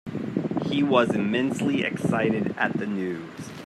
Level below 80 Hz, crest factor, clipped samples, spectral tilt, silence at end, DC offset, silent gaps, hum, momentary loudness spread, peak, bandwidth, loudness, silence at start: -64 dBFS; 18 dB; under 0.1%; -6.5 dB/octave; 0 s; under 0.1%; none; none; 9 LU; -6 dBFS; 13 kHz; -25 LUFS; 0.05 s